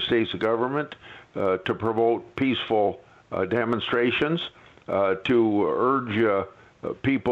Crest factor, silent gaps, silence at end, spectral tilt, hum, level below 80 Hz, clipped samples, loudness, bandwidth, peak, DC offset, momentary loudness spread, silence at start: 14 dB; none; 0 s; -7.5 dB/octave; none; -60 dBFS; under 0.1%; -24 LUFS; 7.2 kHz; -10 dBFS; under 0.1%; 14 LU; 0 s